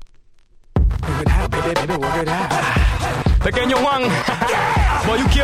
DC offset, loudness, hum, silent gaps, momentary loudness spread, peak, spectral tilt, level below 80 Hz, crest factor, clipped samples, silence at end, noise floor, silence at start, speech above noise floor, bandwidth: under 0.1%; -18 LUFS; none; none; 4 LU; -4 dBFS; -5.5 dB/octave; -22 dBFS; 14 dB; under 0.1%; 0 s; -47 dBFS; 0 s; 30 dB; 14.5 kHz